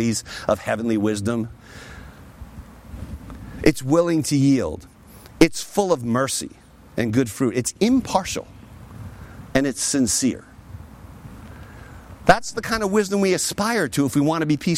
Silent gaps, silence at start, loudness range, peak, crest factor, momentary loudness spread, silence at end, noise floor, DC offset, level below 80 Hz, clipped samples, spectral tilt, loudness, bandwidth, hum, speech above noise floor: none; 0 s; 4 LU; -2 dBFS; 20 dB; 23 LU; 0 s; -45 dBFS; under 0.1%; -44 dBFS; under 0.1%; -4.5 dB/octave; -21 LUFS; 16.5 kHz; none; 24 dB